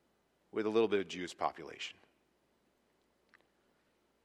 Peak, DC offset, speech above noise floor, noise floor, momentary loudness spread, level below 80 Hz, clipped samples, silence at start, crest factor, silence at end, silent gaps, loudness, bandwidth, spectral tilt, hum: -18 dBFS; under 0.1%; 40 dB; -76 dBFS; 13 LU; -80 dBFS; under 0.1%; 0.55 s; 22 dB; 2.3 s; none; -37 LUFS; 11.5 kHz; -4.5 dB/octave; none